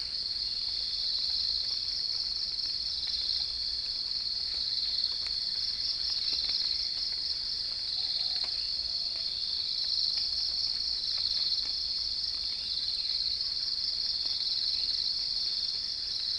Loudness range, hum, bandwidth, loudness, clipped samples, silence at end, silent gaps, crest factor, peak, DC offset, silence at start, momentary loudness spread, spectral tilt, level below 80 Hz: 1 LU; none; 10.5 kHz; -29 LUFS; under 0.1%; 0 s; none; 16 dB; -16 dBFS; under 0.1%; 0 s; 3 LU; 0 dB/octave; -56 dBFS